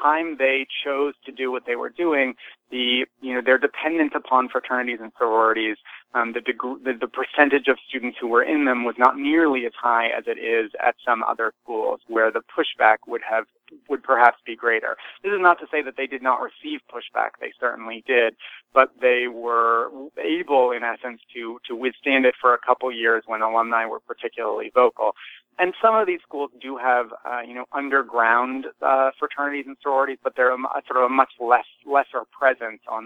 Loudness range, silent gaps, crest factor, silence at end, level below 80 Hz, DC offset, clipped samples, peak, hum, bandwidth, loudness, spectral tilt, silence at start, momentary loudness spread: 2 LU; none; 22 dB; 0 s; -72 dBFS; under 0.1%; under 0.1%; 0 dBFS; none; 5.4 kHz; -22 LUFS; -5 dB/octave; 0 s; 11 LU